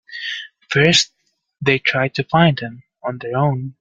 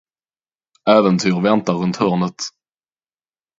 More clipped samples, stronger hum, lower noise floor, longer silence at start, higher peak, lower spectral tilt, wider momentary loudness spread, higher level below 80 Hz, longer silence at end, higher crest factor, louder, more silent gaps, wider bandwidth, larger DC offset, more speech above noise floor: neither; neither; second, -54 dBFS vs under -90 dBFS; second, 0.1 s vs 0.85 s; about the same, 0 dBFS vs 0 dBFS; second, -4.5 dB/octave vs -6 dB/octave; first, 15 LU vs 11 LU; about the same, -56 dBFS vs -60 dBFS; second, 0.1 s vs 1.1 s; about the same, 20 dB vs 18 dB; about the same, -17 LUFS vs -17 LUFS; neither; first, 9.4 kHz vs 7.8 kHz; neither; second, 36 dB vs over 74 dB